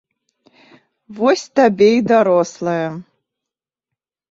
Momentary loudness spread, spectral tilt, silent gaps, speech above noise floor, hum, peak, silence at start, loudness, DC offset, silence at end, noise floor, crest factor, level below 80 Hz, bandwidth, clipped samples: 10 LU; -5.5 dB/octave; none; 71 dB; none; -2 dBFS; 1.1 s; -15 LUFS; under 0.1%; 1.3 s; -86 dBFS; 16 dB; -64 dBFS; 7.8 kHz; under 0.1%